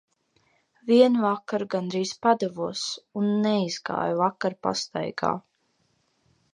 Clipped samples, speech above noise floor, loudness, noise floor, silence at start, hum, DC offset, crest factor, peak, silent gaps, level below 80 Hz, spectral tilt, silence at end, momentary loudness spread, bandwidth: under 0.1%; 45 dB; -25 LUFS; -70 dBFS; 0.85 s; none; under 0.1%; 20 dB; -6 dBFS; none; -70 dBFS; -5 dB/octave; 1.15 s; 10 LU; 10 kHz